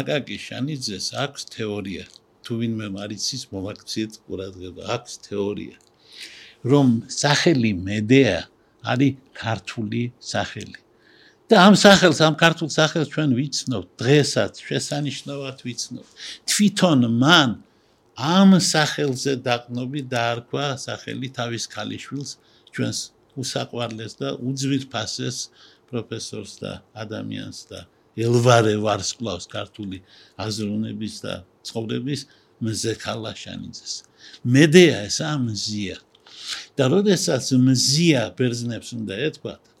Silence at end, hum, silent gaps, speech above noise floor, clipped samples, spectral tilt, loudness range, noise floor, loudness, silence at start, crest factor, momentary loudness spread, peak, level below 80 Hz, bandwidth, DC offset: 0.25 s; none; none; 37 dB; under 0.1%; -4.5 dB/octave; 12 LU; -58 dBFS; -21 LUFS; 0 s; 22 dB; 18 LU; 0 dBFS; -60 dBFS; 16.5 kHz; under 0.1%